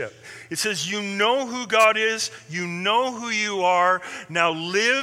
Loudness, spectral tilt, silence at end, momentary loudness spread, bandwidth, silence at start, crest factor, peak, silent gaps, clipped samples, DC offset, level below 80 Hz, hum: -22 LUFS; -2.5 dB/octave; 0 s; 10 LU; 16.5 kHz; 0 s; 20 dB; -4 dBFS; none; under 0.1%; under 0.1%; -74 dBFS; none